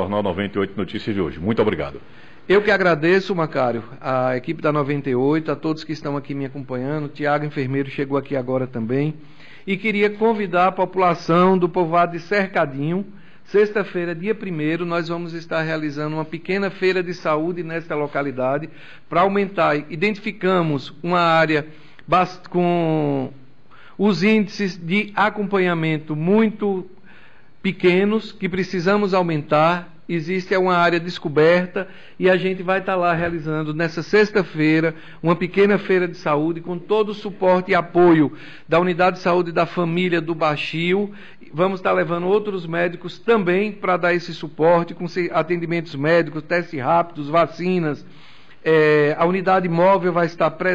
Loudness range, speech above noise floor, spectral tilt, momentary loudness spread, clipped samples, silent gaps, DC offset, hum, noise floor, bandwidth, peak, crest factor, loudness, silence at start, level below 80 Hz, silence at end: 4 LU; 31 dB; -7.5 dB/octave; 10 LU; under 0.1%; none; 0.9%; none; -51 dBFS; 7.8 kHz; -6 dBFS; 12 dB; -20 LUFS; 0 s; -54 dBFS; 0 s